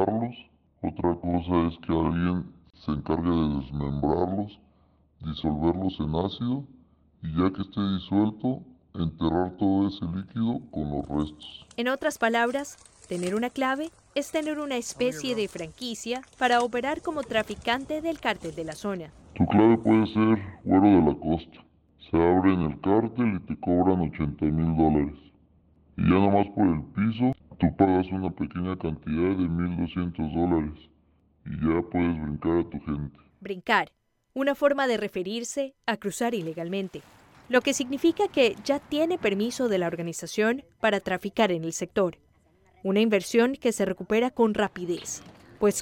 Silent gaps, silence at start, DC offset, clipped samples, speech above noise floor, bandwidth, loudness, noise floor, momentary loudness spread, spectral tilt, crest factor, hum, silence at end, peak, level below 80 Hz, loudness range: none; 0 s; under 0.1%; under 0.1%; 38 dB; 16.5 kHz; -26 LUFS; -64 dBFS; 11 LU; -6 dB/octave; 20 dB; none; 0 s; -6 dBFS; -48 dBFS; 5 LU